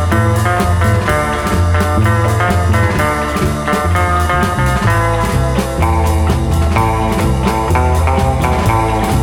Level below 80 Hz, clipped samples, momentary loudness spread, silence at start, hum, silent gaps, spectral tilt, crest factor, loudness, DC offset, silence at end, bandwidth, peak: -20 dBFS; under 0.1%; 2 LU; 0 s; none; none; -6 dB/octave; 12 dB; -14 LUFS; under 0.1%; 0 s; 17 kHz; 0 dBFS